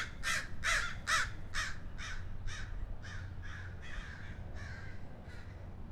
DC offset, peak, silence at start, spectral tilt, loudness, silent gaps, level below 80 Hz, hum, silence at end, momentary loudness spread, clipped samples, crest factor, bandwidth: under 0.1%; -20 dBFS; 0 s; -2.5 dB/octave; -39 LUFS; none; -46 dBFS; none; 0 s; 16 LU; under 0.1%; 20 dB; 15 kHz